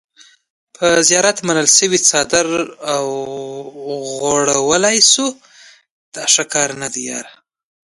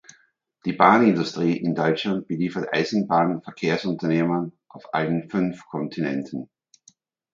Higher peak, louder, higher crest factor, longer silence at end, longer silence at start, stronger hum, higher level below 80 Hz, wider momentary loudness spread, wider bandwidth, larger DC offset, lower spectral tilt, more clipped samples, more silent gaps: about the same, 0 dBFS vs 0 dBFS; first, -14 LUFS vs -23 LUFS; second, 16 dB vs 24 dB; second, 0.55 s vs 0.9 s; first, 0.8 s vs 0.65 s; neither; first, -56 dBFS vs -64 dBFS; first, 16 LU vs 13 LU; first, 16 kHz vs 7.6 kHz; neither; second, -1.5 dB/octave vs -6.5 dB/octave; neither; first, 5.90-6.12 s vs none